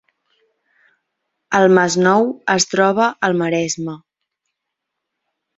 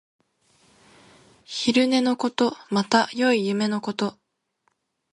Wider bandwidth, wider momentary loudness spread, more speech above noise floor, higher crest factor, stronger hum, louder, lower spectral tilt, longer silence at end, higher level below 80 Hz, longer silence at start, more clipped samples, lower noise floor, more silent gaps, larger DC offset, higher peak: second, 8 kHz vs 11.5 kHz; about the same, 10 LU vs 8 LU; first, 64 dB vs 50 dB; about the same, 18 dB vs 20 dB; neither; first, -16 LUFS vs -23 LUFS; about the same, -4 dB/octave vs -4.5 dB/octave; first, 1.6 s vs 1 s; first, -62 dBFS vs -70 dBFS; about the same, 1.5 s vs 1.5 s; neither; first, -79 dBFS vs -72 dBFS; neither; neither; first, 0 dBFS vs -4 dBFS